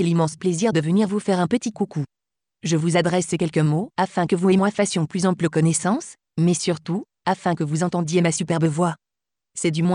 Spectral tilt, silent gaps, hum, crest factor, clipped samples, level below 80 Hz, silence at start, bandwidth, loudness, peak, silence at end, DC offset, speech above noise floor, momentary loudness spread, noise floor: -5.5 dB/octave; none; none; 14 dB; under 0.1%; -62 dBFS; 0 s; 11 kHz; -22 LUFS; -8 dBFS; 0 s; under 0.1%; 68 dB; 7 LU; -89 dBFS